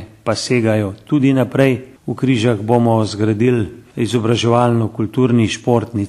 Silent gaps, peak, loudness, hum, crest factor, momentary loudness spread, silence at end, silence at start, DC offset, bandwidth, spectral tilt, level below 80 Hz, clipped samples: none; 0 dBFS; -16 LUFS; none; 16 dB; 7 LU; 0 s; 0 s; under 0.1%; 12.5 kHz; -6.5 dB/octave; -50 dBFS; under 0.1%